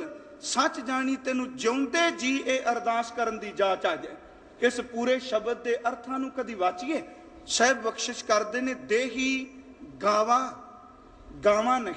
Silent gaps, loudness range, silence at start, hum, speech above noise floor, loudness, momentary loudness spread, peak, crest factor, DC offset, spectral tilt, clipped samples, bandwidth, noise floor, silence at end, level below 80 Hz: none; 2 LU; 0 s; none; 23 dB; -27 LUFS; 12 LU; -8 dBFS; 20 dB; under 0.1%; -2.5 dB/octave; under 0.1%; 10 kHz; -50 dBFS; 0 s; -62 dBFS